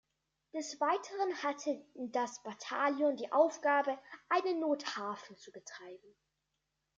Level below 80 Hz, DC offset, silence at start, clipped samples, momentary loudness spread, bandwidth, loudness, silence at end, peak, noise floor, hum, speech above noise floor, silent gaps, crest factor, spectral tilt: -88 dBFS; under 0.1%; 0.55 s; under 0.1%; 19 LU; 7.8 kHz; -35 LUFS; 0.9 s; -16 dBFS; -85 dBFS; none; 50 dB; none; 20 dB; -3 dB/octave